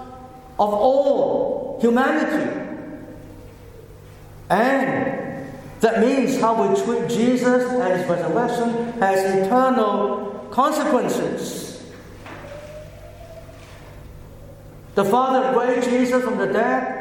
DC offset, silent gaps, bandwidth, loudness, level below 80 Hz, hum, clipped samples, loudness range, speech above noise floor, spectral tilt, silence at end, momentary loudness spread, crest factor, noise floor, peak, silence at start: under 0.1%; none; 17.5 kHz; -20 LUFS; -50 dBFS; none; under 0.1%; 8 LU; 23 dB; -5.5 dB/octave; 0 s; 22 LU; 18 dB; -42 dBFS; -4 dBFS; 0 s